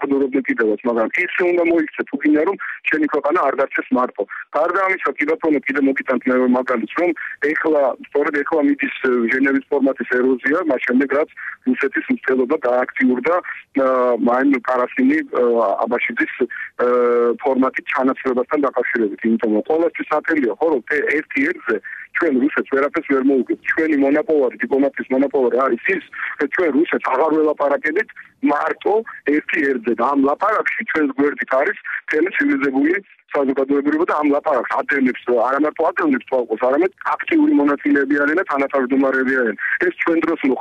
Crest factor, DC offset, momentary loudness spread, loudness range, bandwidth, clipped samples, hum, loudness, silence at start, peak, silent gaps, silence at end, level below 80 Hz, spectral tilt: 12 dB; under 0.1%; 4 LU; 1 LU; 6.8 kHz; under 0.1%; none; -18 LUFS; 0 s; -6 dBFS; none; 0 s; -64 dBFS; -7 dB/octave